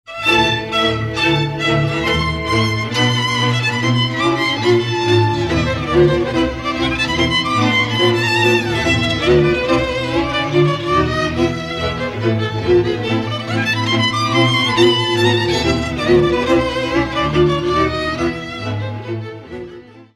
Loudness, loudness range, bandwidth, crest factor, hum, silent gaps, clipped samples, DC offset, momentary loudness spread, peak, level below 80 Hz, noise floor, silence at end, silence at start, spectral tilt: -16 LUFS; 3 LU; 12.5 kHz; 16 dB; none; none; under 0.1%; under 0.1%; 7 LU; -2 dBFS; -34 dBFS; -37 dBFS; 0.1 s; 0.1 s; -5.5 dB/octave